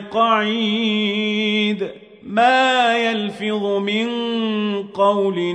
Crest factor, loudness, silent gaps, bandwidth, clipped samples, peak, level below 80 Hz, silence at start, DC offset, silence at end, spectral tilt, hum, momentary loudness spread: 14 dB; -18 LUFS; none; 10 kHz; under 0.1%; -4 dBFS; -68 dBFS; 0 s; under 0.1%; 0 s; -5 dB/octave; none; 8 LU